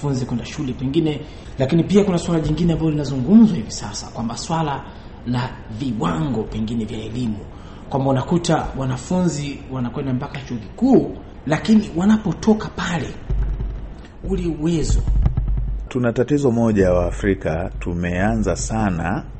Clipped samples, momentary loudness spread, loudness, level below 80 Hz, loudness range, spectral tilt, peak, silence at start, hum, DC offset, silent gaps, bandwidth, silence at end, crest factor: under 0.1%; 12 LU; -20 LUFS; -30 dBFS; 6 LU; -6.5 dB/octave; -2 dBFS; 0 s; none; under 0.1%; none; 8.8 kHz; 0 s; 16 dB